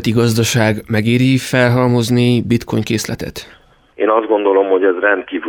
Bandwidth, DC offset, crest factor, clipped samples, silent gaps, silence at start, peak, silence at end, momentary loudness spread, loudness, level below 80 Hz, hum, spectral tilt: 18.5 kHz; under 0.1%; 14 dB; under 0.1%; none; 0 s; 0 dBFS; 0 s; 7 LU; -14 LUFS; -46 dBFS; none; -5.5 dB/octave